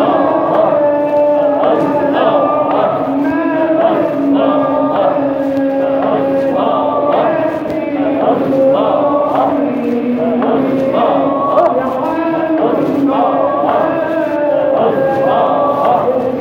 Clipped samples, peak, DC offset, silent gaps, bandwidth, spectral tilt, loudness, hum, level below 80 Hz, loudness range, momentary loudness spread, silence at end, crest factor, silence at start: under 0.1%; 0 dBFS; under 0.1%; none; 6.4 kHz; -8 dB/octave; -13 LUFS; none; -52 dBFS; 1 LU; 3 LU; 0 s; 12 dB; 0 s